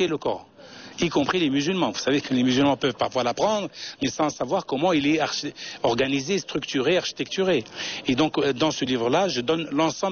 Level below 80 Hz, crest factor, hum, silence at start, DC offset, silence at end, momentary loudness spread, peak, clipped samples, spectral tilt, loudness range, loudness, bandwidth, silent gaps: -58 dBFS; 14 dB; none; 0 s; under 0.1%; 0 s; 7 LU; -10 dBFS; under 0.1%; -3.5 dB/octave; 1 LU; -24 LUFS; 6.8 kHz; none